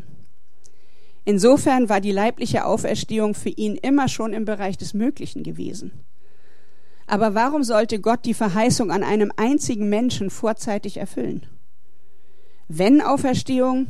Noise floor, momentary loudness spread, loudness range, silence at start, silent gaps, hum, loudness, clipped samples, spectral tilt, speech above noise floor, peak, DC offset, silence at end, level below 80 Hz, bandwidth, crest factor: -64 dBFS; 14 LU; 6 LU; 1.25 s; none; none; -21 LUFS; under 0.1%; -5.5 dB/octave; 43 dB; -2 dBFS; 4%; 0 s; -54 dBFS; 14 kHz; 18 dB